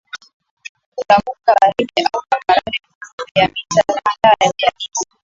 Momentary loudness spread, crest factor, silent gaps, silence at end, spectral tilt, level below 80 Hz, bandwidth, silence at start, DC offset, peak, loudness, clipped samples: 22 LU; 16 dB; 0.33-0.40 s, 0.51-0.57 s, 0.69-0.75 s, 0.86-0.92 s, 2.95-3.01 s, 3.13-3.18 s, 3.31-3.35 s; 0.2 s; -3 dB/octave; -52 dBFS; 7.8 kHz; 0.15 s; under 0.1%; 0 dBFS; -15 LUFS; under 0.1%